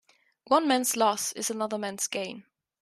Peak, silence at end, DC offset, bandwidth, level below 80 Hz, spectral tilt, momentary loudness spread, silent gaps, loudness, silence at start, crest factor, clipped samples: -10 dBFS; 0.4 s; under 0.1%; 14.5 kHz; -78 dBFS; -2 dB/octave; 10 LU; none; -27 LUFS; 0.5 s; 20 dB; under 0.1%